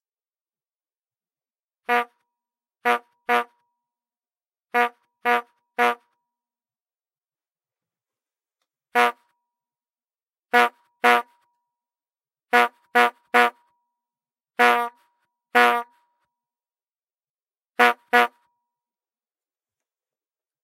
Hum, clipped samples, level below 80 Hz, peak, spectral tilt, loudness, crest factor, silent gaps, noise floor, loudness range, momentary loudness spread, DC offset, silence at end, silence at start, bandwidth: none; under 0.1%; -88 dBFS; -2 dBFS; -1 dB/octave; -21 LUFS; 24 dB; 17.30-17.35 s; under -90 dBFS; 8 LU; 10 LU; under 0.1%; 2.35 s; 1.9 s; 16 kHz